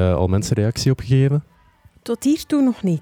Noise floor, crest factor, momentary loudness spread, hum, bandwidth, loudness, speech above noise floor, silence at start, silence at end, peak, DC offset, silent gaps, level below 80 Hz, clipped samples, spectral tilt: -52 dBFS; 14 dB; 7 LU; none; 17 kHz; -19 LUFS; 34 dB; 0 s; 0 s; -4 dBFS; under 0.1%; none; -44 dBFS; under 0.1%; -7 dB/octave